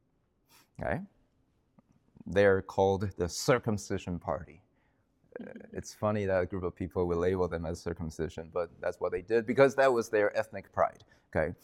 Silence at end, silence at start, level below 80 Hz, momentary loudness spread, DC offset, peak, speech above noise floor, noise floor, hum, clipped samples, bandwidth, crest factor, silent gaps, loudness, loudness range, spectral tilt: 0.1 s; 0.8 s; -58 dBFS; 14 LU; under 0.1%; -12 dBFS; 43 dB; -73 dBFS; none; under 0.1%; 15.5 kHz; 20 dB; none; -31 LUFS; 5 LU; -5.5 dB/octave